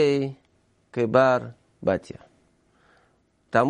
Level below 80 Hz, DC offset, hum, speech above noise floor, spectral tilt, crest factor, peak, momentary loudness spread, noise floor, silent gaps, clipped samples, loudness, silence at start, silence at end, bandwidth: -62 dBFS; under 0.1%; none; 43 dB; -7 dB/octave; 20 dB; -6 dBFS; 23 LU; -65 dBFS; none; under 0.1%; -24 LUFS; 0 s; 0 s; 9.6 kHz